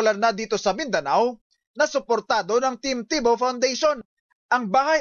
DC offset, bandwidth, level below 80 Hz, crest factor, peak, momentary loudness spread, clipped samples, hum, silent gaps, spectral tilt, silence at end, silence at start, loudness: under 0.1%; 7.4 kHz; -60 dBFS; 14 dB; -10 dBFS; 4 LU; under 0.1%; none; 1.41-1.50 s, 1.67-1.74 s, 4.05-4.49 s; -3 dB/octave; 0 s; 0 s; -23 LUFS